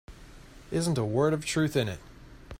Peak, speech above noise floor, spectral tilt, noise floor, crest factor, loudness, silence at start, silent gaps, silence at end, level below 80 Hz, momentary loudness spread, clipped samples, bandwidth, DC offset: -12 dBFS; 22 dB; -5.5 dB/octave; -49 dBFS; 18 dB; -28 LUFS; 0.1 s; none; 0 s; -52 dBFS; 8 LU; under 0.1%; 16 kHz; under 0.1%